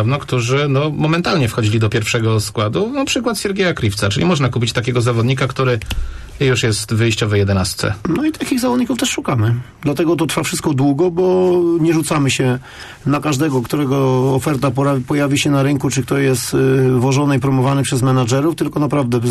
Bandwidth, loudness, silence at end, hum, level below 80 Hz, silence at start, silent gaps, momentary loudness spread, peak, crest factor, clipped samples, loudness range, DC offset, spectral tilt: 13 kHz; -16 LUFS; 0 s; none; -38 dBFS; 0 s; none; 4 LU; -6 dBFS; 10 dB; under 0.1%; 2 LU; under 0.1%; -5.5 dB/octave